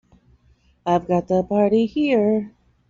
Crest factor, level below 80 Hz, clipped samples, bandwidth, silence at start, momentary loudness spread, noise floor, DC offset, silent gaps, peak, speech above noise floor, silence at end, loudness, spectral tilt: 16 dB; -54 dBFS; under 0.1%; 7.4 kHz; 0.85 s; 7 LU; -58 dBFS; under 0.1%; none; -6 dBFS; 39 dB; 0.4 s; -20 LUFS; -6.5 dB/octave